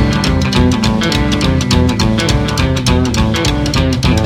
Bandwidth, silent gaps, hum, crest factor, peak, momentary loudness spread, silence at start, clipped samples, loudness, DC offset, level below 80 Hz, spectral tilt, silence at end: 16 kHz; none; none; 12 dB; 0 dBFS; 2 LU; 0 s; under 0.1%; -13 LUFS; under 0.1%; -20 dBFS; -5.5 dB/octave; 0 s